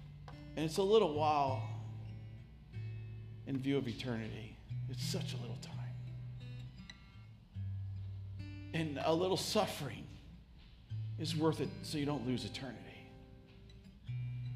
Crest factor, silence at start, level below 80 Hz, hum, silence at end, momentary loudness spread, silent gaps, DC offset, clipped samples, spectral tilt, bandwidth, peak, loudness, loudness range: 22 dB; 0 s; -60 dBFS; none; 0 s; 21 LU; none; under 0.1%; under 0.1%; -6 dB/octave; 15.5 kHz; -18 dBFS; -39 LUFS; 8 LU